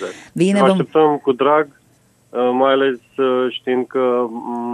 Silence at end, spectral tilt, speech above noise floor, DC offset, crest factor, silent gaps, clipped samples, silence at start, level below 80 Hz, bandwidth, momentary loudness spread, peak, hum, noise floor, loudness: 0 s; -6.5 dB/octave; 39 dB; under 0.1%; 16 dB; none; under 0.1%; 0 s; -68 dBFS; 11.5 kHz; 9 LU; 0 dBFS; none; -55 dBFS; -17 LUFS